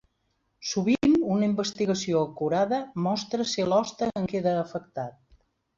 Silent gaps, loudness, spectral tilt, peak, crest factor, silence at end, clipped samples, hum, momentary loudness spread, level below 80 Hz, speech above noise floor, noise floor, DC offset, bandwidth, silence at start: none; -26 LUFS; -5.5 dB/octave; -12 dBFS; 16 dB; 0.7 s; under 0.1%; none; 12 LU; -60 dBFS; 48 dB; -74 dBFS; under 0.1%; 7.6 kHz; 0.6 s